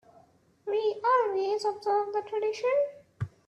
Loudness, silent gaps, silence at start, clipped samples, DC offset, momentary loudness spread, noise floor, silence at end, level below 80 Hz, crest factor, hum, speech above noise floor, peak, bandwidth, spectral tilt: -29 LUFS; none; 0.65 s; under 0.1%; under 0.1%; 11 LU; -61 dBFS; 0.2 s; -68 dBFS; 16 dB; none; 32 dB; -14 dBFS; 10 kHz; -5.5 dB/octave